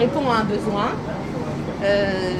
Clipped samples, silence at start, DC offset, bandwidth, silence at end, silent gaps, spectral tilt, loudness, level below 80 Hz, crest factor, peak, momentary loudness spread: under 0.1%; 0 s; under 0.1%; 13 kHz; 0 s; none; -6.5 dB/octave; -22 LUFS; -44 dBFS; 14 dB; -6 dBFS; 8 LU